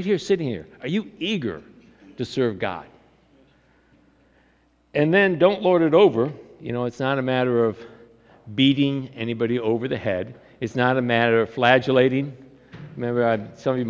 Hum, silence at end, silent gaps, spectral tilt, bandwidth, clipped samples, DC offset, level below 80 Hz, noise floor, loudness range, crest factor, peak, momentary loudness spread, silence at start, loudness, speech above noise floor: none; 0 s; none; -7 dB/octave; 7.8 kHz; under 0.1%; under 0.1%; -58 dBFS; -61 dBFS; 9 LU; 20 dB; -2 dBFS; 15 LU; 0 s; -22 LUFS; 40 dB